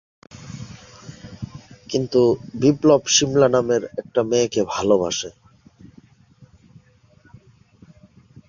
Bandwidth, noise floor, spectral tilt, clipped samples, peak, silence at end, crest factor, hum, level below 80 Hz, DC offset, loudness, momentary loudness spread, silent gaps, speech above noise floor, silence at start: 7.4 kHz; -54 dBFS; -4 dB/octave; under 0.1%; -2 dBFS; 2.05 s; 20 dB; none; -54 dBFS; under 0.1%; -19 LUFS; 24 LU; none; 36 dB; 0.4 s